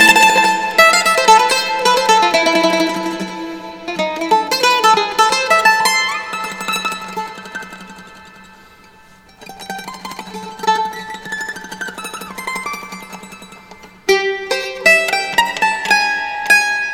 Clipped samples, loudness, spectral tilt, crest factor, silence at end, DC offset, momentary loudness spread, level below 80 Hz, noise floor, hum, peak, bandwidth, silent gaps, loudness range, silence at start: under 0.1%; -14 LUFS; -1.5 dB/octave; 16 dB; 0 s; under 0.1%; 19 LU; -54 dBFS; -45 dBFS; none; 0 dBFS; over 20 kHz; none; 14 LU; 0 s